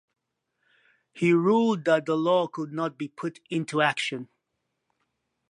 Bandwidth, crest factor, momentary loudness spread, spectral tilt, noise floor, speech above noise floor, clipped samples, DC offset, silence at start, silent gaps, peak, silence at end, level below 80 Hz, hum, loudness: 11 kHz; 20 dB; 12 LU; -6 dB/octave; -80 dBFS; 55 dB; under 0.1%; under 0.1%; 1.15 s; none; -8 dBFS; 1.25 s; -78 dBFS; none; -25 LUFS